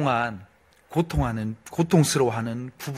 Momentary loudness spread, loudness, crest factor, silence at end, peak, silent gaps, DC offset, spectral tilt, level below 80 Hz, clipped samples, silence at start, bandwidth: 12 LU; -25 LUFS; 20 dB; 0 s; -6 dBFS; none; under 0.1%; -5.5 dB/octave; -42 dBFS; under 0.1%; 0 s; 16 kHz